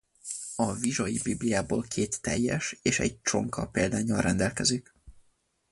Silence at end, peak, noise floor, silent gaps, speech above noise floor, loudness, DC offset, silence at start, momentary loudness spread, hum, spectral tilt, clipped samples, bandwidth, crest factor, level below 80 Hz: 0.5 s; -8 dBFS; -70 dBFS; none; 41 dB; -29 LUFS; under 0.1%; 0.25 s; 5 LU; none; -4 dB/octave; under 0.1%; 11.5 kHz; 20 dB; -50 dBFS